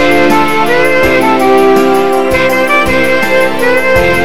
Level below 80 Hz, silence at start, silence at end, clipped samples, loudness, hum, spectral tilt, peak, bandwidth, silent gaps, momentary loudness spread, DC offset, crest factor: -30 dBFS; 0 s; 0 s; under 0.1%; -8 LUFS; none; -4.5 dB/octave; 0 dBFS; 16.5 kHz; none; 2 LU; 10%; 10 dB